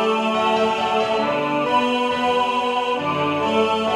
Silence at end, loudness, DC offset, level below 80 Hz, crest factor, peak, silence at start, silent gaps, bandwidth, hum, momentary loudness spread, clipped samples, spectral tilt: 0 s; -20 LUFS; under 0.1%; -58 dBFS; 14 dB; -6 dBFS; 0 s; none; 13 kHz; none; 2 LU; under 0.1%; -4.5 dB/octave